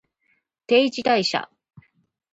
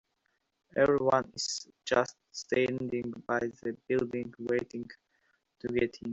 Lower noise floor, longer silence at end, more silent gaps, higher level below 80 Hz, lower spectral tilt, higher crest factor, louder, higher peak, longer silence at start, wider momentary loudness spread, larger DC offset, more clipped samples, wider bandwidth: second, -69 dBFS vs -78 dBFS; first, 0.9 s vs 0 s; neither; about the same, -70 dBFS vs -66 dBFS; about the same, -4 dB/octave vs -4.5 dB/octave; about the same, 18 dB vs 22 dB; first, -21 LUFS vs -32 LUFS; first, -6 dBFS vs -12 dBFS; about the same, 0.7 s vs 0.75 s; second, 10 LU vs 13 LU; neither; neither; about the same, 8 kHz vs 8.2 kHz